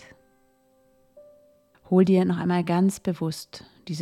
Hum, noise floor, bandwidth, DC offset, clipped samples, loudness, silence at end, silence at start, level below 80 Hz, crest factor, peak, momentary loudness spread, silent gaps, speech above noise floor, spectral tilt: none; -63 dBFS; 13.5 kHz; under 0.1%; under 0.1%; -23 LUFS; 0 s; 1.15 s; -64 dBFS; 18 dB; -8 dBFS; 17 LU; none; 40 dB; -7 dB/octave